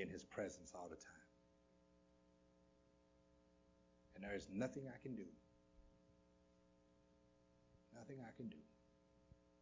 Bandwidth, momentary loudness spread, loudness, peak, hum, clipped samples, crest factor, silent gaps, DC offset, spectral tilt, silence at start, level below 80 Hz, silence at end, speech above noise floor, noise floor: 7.8 kHz; 17 LU; -52 LUFS; -32 dBFS; none; under 0.1%; 24 dB; none; under 0.1%; -5.5 dB/octave; 0 s; -76 dBFS; 0 s; 23 dB; -75 dBFS